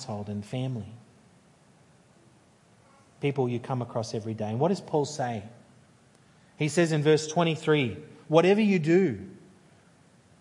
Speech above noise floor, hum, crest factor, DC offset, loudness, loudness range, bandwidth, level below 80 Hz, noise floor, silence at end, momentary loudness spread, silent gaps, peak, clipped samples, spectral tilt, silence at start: 33 dB; none; 22 dB; under 0.1%; -27 LUFS; 11 LU; 11.5 kHz; -74 dBFS; -59 dBFS; 1 s; 13 LU; none; -6 dBFS; under 0.1%; -6 dB/octave; 0 s